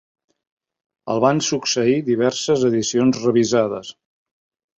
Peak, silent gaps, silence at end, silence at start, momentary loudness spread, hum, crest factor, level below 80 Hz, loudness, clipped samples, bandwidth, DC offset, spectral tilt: -2 dBFS; none; 0.85 s; 1.05 s; 8 LU; none; 18 dB; -60 dBFS; -18 LUFS; under 0.1%; 8.2 kHz; under 0.1%; -4.5 dB/octave